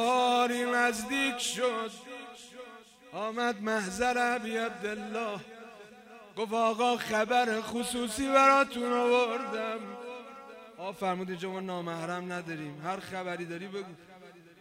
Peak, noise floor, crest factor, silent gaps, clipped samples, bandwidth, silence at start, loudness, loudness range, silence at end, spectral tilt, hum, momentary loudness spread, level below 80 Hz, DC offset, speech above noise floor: -10 dBFS; -53 dBFS; 20 dB; none; under 0.1%; 16 kHz; 0 s; -30 LUFS; 10 LU; 0.2 s; -3.5 dB/octave; none; 20 LU; -66 dBFS; under 0.1%; 22 dB